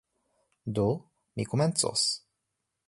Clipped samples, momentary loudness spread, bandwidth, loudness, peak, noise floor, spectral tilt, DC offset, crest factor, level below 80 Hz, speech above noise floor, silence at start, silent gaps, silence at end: under 0.1%; 12 LU; 11.5 kHz; -29 LUFS; -12 dBFS; -83 dBFS; -4 dB/octave; under 0.1%; 20 dB; -60 dBFS; 55 dB; 0.65 s; none; 0.7 s